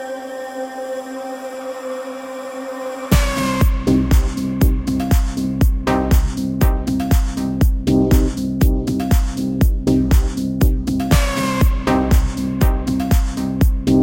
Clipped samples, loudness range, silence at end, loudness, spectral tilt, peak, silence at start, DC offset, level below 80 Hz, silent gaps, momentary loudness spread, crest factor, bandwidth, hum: under 0.1%; 3 LU; 0 s; -18 LUFS; -6.5 dB/octave; -2 dBFS; 0 s; under 0.1%; -20 dBFS; none; 12 LU; 14 dB; 17 kHz; none